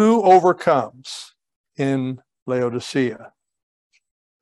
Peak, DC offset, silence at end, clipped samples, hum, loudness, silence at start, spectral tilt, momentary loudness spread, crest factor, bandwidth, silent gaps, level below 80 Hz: -2 dBFS; under 0.1%; 1.15 s; under 0.1%; none; -19 LUFS; 0 s; -6 dB/octave; 20 LU; 18 dB; 12 kHz; 1.56-1.64 s, 2.42-2.46 s; -70 dBFS